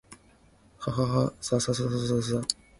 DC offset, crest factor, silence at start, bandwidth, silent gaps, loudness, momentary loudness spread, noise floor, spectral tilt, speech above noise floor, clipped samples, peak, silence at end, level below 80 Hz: under 0.1%; 22 dB; 0.1 s; 11.5 kHz; none; -28 LUFS; 4 LU; -59 dBFS; -5.5 dB/octave; 32 dB; under 0.1%; -8 dBFS; 0.25 s; -54 dBFS